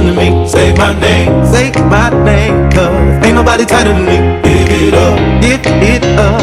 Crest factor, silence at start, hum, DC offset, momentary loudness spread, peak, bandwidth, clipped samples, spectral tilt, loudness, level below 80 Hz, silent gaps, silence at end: 8 dB; 0 s; none; under 0.1%; 1 LU; 0 dBFS; 14 kHz; 0.1%; -6 dB/octave; -8 LUFS; -16 dBFS; none; 0 s